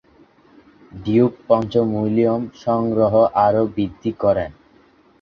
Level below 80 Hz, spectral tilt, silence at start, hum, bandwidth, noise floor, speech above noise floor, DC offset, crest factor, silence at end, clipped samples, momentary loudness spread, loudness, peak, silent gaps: -50 dBFS; -9 dB/octave; 0.95 s; none; 6.6 kHz; -53 dBFS; 35 dB; under 0.1%; 18 dB; 0.7 s; under 0.1%; 8 LU; -18 LUFS; -2 dBFS; none